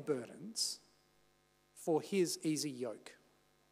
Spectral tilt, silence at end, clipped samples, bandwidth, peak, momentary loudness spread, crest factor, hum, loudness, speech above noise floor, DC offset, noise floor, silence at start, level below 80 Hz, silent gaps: -4 dB/octave; 0.55 s; under 0.1%; 15.5 kHz; -24 dBFS; 13 LU; 18 dB; 50 Hz at -70 dBFS; -38 LUFS; 35 dB; under 0.1%; -73 dBFS; 0 s; -86 dBFS; none